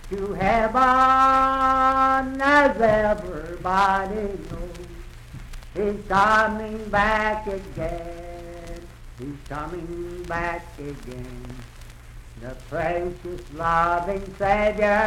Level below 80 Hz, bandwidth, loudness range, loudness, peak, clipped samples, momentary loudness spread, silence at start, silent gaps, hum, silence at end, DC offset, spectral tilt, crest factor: -38 dBFS; 16 kHz; 14 LU; -21 LUFS; -6 dBFS; under 0.1%; 22 LU; 0 s; none; none; 0 s; under 0.1%; -5.5 dB/octave; 16 dB